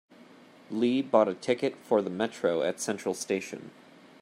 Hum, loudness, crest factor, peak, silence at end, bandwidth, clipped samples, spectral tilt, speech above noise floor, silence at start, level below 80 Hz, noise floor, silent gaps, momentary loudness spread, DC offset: none; -29 LUFS; 22 dB; -8 dBFS; 0.55 s; 15.5 kHz; under 0.1%; -4.5 dB/octave; 25 dB; 0.7 s; -76 dBFS; -54 dBFS; none; 12 LU; under 0.1%